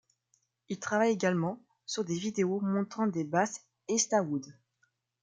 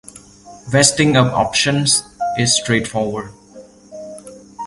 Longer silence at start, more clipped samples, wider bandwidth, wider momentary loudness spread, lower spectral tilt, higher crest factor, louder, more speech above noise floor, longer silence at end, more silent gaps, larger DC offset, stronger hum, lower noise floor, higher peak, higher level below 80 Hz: first, 0.7 s vs 0.15 s; neither; second, 9.6 kHz vs 11.5 kHz; second, 11 LU vs 22 LU; about the same, -4.5 dB/octave vs -3.5 dB/octave; about the same, 20 dB vs 18 dB; second, -31 LUFS vs -15 LUFS; first, 46 dB vs 26 dB; first, 0.7 s vs 0 s; neither; neither; neither; first, -76 dBFS vs -42 dBFS; second, -12 dBFS vs 0 dBFS; second, -78 dBFS vs -48 dBFS